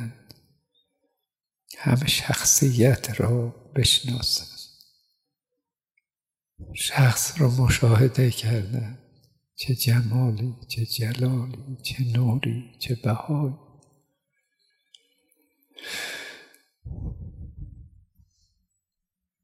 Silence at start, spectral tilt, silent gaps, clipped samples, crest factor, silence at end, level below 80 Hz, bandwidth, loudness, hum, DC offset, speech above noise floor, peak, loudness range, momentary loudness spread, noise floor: 0 s; -4.5 dB/octave; none; under 0.1%; 20 dB; 1.6 s; -48 dBFS; 16 kHz; -23 LUFS; none; under 0.1%; over 67 dB; -6 dBFS; 16 LU; 22 LU; under -90 dBFS